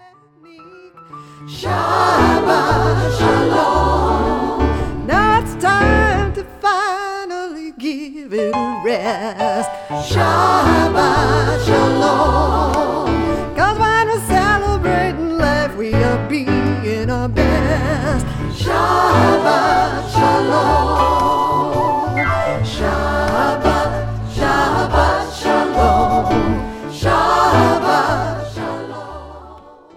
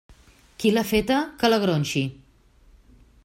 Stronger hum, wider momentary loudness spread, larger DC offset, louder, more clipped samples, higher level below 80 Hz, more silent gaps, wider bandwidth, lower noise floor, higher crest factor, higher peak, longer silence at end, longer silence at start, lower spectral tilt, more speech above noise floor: neither; first, 10 LU vs 6 LU; neither; first, -16 LUFS vs -23 LUFS; neither; first, -28 dBFS vs -50 dBFS; neither; about the same, 16.5 kHz vs 16.5 kHz; second, -46 dBFS vs -56 dBFS; about the same, 14 dB vs 18 dB; first, 0 dBFS vs -6 dBFS; second, 0.25 s vs 1.1 s; first, 0.6 s vs 0.1 s; about the same, -6 dB/octave vs -5.5 dB/octave; about the same, 31 dB vs 34 dB